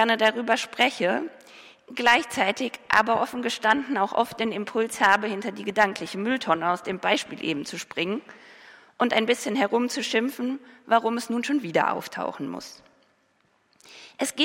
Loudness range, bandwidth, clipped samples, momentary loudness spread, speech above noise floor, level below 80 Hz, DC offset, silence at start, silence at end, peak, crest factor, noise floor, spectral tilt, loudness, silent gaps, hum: 4 LU; 16.5 kHz; under 0.1%; 11 LU; 41 dB; -68 dBFS; under 0.1%; 0 s; 0 s; -6 dBFS; 20 dB; -66 dBFS; -3 dB/octave; -25 LUFS; none; none